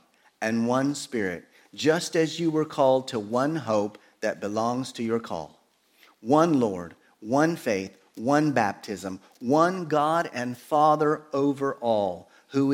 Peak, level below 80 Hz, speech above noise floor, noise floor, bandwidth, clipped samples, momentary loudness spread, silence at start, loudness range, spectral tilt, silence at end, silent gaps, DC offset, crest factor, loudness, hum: -6 dBFS; -70 dBFS; 36 dB; -61 dBFS; 16.5 kHz; under 0.1%; 13 LU; 0.4 s; 3 LU; -5.5 dB/octave; 0 s; none; under 0.1%; 20 dB; -26 LUFS; none